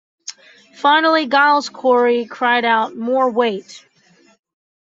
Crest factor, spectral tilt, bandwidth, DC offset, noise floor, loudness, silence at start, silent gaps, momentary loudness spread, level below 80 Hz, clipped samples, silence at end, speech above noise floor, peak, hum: 16 dB; -3 dB/octave; 7.8 kHz; under 0.1%; -54 dBFS; -16 LUFS; 0.3 s; none; 14 LU; -72 dBFS; under 0.1%; 1.15 s; 38 dB; -2 dBFS; none